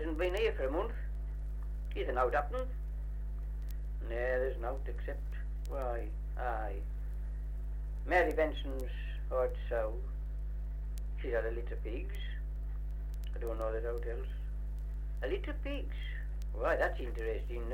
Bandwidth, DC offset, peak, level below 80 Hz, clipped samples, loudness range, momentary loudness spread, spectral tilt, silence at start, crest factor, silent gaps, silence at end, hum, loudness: 6.4 kHz; under 0.1%; -16 dBFS; -38 dBFS; under 0.1%; 5 LU; 10 LU; -7 dB/octave; 0 s; 18 dB; none; 0 s; 50 Hz at -50 dBFS; -38 LUFS